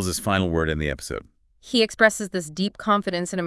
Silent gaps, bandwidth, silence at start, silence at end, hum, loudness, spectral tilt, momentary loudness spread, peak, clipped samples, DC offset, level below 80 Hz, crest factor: none; 12 kHz; 0 s; 0 s; none; -23 LUFS; -4 dB/octave; 11 LU; -4 dBFS; under 0.1%; under 0.1%; -44 dBFS; 20 dB